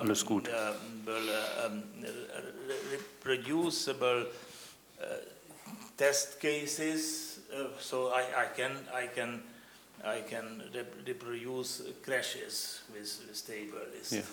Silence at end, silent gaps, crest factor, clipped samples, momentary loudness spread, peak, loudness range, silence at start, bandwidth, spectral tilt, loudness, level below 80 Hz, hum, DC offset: 0 s; none; 22 dB; under 0.1%; 13 LU; -14 dBFS; 5 LU; 0 s; 19.5 kHz; -2.5 dB/octave; -36 LUFS; -78 dBFS; none; under 0.1%